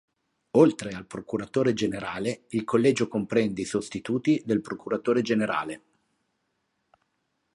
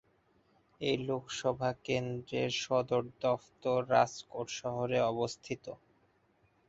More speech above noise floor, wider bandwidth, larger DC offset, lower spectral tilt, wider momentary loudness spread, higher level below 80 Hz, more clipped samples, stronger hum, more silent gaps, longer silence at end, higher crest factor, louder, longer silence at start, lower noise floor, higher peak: first, 51 dB vs 37 dB; first, 11.5 kHz vs 8 kHz; neither; about the same, -6 dB/octave vs -5 dB/octave; about the same, 11 LU vs 12 LU; first, -62 dBFS vs -68 dBFS; neither; neither; neither; first, 1.75 s vs 0.95 s; about the same, 22 dB vs 22 dB; first, -26 LUFS vs -34 LUFS; second, 0.55 s vs 0.8 s; first, -76 dBFS vs -71 dBFS; first, -6 dBFS vs -14 dBFS